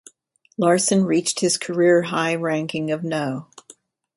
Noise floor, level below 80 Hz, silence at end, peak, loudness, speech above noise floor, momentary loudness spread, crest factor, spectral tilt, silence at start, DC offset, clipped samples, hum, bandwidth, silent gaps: -57 dBFS; -66 dBFS; 0.75 s; -4 dBFS; -20 LUFS; 37 dB; 8 LU; 16 dB; -4 dB/octave; 0.6 s; under 0.1%; under 0.1%; none; 11.5 kHz; none